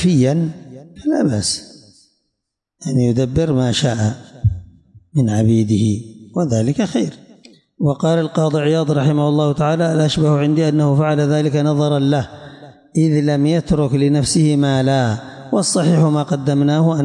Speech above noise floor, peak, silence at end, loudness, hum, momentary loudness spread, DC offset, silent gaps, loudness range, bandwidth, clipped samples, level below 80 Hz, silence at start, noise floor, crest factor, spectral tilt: 62 dB; -4 dBFS; 0 s; -16 LUFS; none; 7 LU; under 0.1%; none; 4 LU; 11.5 kHz; under 0.1%; -44 dBFS; 0 s; -77 dBFS; 12 dB; -6.5 dB/octave